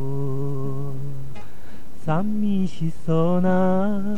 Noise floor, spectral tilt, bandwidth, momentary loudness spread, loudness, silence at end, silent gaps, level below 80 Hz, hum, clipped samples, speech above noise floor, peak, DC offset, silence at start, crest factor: -44 dBFS; -9 dB/octave; 12.5 kHz; 14 LU; -24 LUFS; 0 s; none; -50 dBFS; none; under 0.1%; 23 dB; -8 dBFS; 9%; 0 s; 14 dB